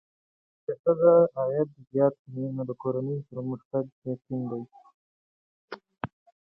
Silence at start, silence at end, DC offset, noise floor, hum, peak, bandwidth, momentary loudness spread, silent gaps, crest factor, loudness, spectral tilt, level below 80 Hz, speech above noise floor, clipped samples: 0.7 s; 0.45 s; under 0.1%; under -90 dBFS; none; -8 dBFS; 5.4 kHz; 19 LU; 0.79-0.84 s, 2.19-2.25 s, 3.65-3.71 s, 3.92-4.02 s, 4.94-5.68 s; 20 dB; -27 LUFS; -11.5 dB/octave; -70 dBFS; over 64 dB; under 0.1%